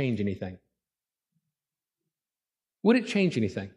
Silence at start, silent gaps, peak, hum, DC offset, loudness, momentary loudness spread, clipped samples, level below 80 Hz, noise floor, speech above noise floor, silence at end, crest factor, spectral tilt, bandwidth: 0 s; none; -10 dBFS; none; under 0.1%; -27 LUFS; 12 LU; under 0.1%; -70 dBFS; under -90 dBFS; over 63 dB; 0.05 s; 20 dB; -7 dB/octave; 11 kHz